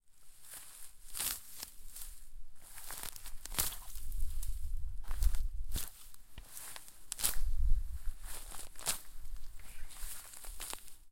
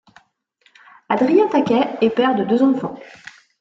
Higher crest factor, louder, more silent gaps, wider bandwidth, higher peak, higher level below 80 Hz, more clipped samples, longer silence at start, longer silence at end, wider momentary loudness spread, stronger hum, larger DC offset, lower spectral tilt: first, 26 dB vs 16 dB; second, -42 LUFS vs -17 LUFS; neither; first, 17 kHz vs 7.6 kHz; second, -8 dBFS vs -4 dBFS; first, -40 dBFS vs -64 dBFS; neither; second, 0 s vs 1.1 s; second, 0.05 s vs 0.55 s; first, 17 LU vs 14 LU; neither; first, 0.3% vs under 0.1%; second, -1.5 dB/octave vs -7 dB/octave